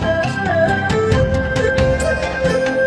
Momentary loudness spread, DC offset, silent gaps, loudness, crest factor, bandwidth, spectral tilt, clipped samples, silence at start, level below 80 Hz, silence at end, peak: 2 LU; under 0.1%; none; -17 LUFS; 14 dB; 11 kHz; -6 dB/octave; under 0.1%; 0 s; -28 dBFS; 0 s; -2 dBFS